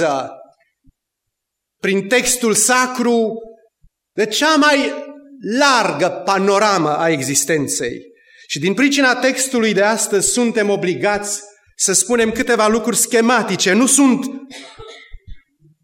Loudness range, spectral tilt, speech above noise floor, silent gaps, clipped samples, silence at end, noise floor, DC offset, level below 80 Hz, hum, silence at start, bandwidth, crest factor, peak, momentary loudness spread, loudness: 3 LU; -2.5 dB/octave; 63 dB; none; under 0.1%; 0.45 s; -79 dBFS; under 0.1%; -50 dBFS; none; 0 s; 16.5 kHz; 16 dB; 0 dBFS; 13 LU; -15 LUFS